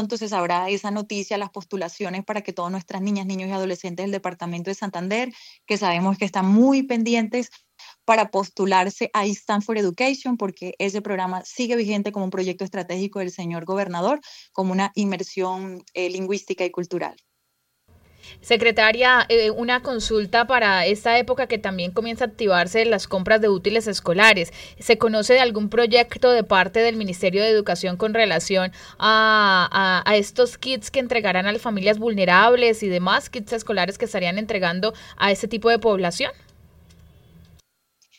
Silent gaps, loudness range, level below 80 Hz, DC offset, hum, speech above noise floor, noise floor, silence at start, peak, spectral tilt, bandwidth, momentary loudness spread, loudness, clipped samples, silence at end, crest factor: none; 8 LU; -54 dBFS; under 0.1%; none; 51 dB; -72 dBFS; 0 s; 0 dBFS; -4.5 dB/octave; 16 kHz; 13 LU; -21 LUFS; under 0.1%; 1.85 s; 22 dB